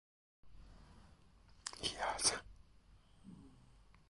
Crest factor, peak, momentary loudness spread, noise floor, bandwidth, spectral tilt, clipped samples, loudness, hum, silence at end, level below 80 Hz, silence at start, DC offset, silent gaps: 28 dB; -18 dBFS; 28 LU; -66 dBFS; 11.5 kHz; -0.5 dB/octave; under 0.1%; -39 LUFS; none; 0.25 s; -64 dBFS; 0.45 s; under 0.1%; none